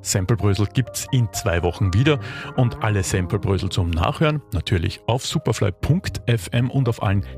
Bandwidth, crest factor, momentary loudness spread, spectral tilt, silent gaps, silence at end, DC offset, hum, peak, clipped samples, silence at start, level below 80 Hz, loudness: 15.5 kHz; 14 dB; 4 LU; -5.5 dB/octave; none; 0 s; under 0.1%; none; -6 dBFS; under 0.1%; 0 s; -38 dBFS; -21 LUFS